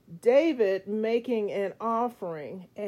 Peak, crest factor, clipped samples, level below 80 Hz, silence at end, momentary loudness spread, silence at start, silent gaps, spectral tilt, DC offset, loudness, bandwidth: -10 dBFS; 16 dB; under 0.1%; -76 dBFS; 0 s; 14 LU; 0.1 s; none; -6.5 dB/octave; under 0.1%; -27 LUFS; 13 kHz